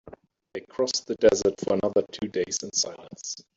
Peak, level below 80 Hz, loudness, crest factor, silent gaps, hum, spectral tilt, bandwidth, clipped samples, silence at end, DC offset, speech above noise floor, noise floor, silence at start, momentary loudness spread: -6 dBFS; -58 dBFS; -26 LUFS; 20 dB; none; none; -3 dB/octave; 8 kHz; under 0.1%; 0.15 s; under 0.1%; 24 dB; -50 dBFS; 0.05 s; 16 LU